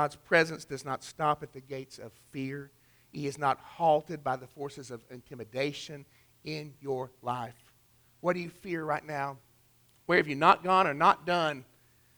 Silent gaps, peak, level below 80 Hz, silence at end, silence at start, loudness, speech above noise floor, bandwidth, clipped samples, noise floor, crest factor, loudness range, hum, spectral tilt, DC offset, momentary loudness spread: none; -8 dBFS; -68 dBFS; 0.55 s; 0 s; -30 LUFS; 34 dB; over 20 kHz; under 0.1%; -65 dBFS; 24 dB; 10 LU; none; -5 dB/octave; under 0.1%; 20 LU